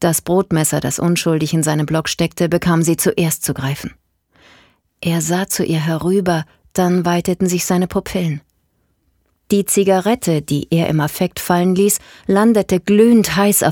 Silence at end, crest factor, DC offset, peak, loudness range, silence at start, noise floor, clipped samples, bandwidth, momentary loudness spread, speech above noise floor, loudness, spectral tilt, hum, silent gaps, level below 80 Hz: 0 s; 14 dB; under 0.1%; -2 dBFS; 5 LU; 0 s; -63 dBFS; under 0.1%; 19 kHz; 7 LU; 48 dB; -16 LUFS; -5 dB/octave; none; none; -46 dBFS